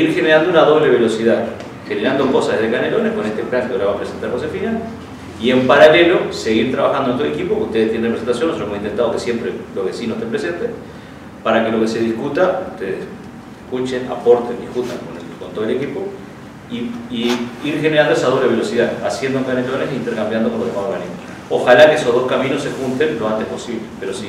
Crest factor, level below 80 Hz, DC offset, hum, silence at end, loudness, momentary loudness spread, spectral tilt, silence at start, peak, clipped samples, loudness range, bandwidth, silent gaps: 16 dB; -52 dBFS; under 0.1%; none; 0 s; -17 LUFS; 15 LU; -5.5 dB/octave; 0 s; 0 dBFS; under 0.1%; 6 LU; 14 kHz; none